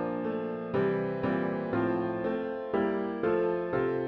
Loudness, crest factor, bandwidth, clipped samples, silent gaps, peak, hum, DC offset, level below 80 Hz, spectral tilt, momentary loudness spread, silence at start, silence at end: -31 LUFS; 14 dB; 5.4 kHz; under 0.1%; none; -16 dBFS; none; under 0.1%; -62 dBFS; -10 dB/octave; 4 LU; 0 s; 0 s